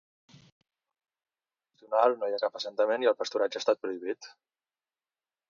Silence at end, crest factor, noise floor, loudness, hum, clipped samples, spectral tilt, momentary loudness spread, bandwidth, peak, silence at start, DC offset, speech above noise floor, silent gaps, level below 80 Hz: 1.2 s; 22 dB; under -90 dBFS; -29 LUFS; none; under 0.1%; -3 dB/octave; 11 LU; 7.4 kHz; -10 dBFS; 1.9 s; under 0.1%; over 61 dB; none; -88 dBFS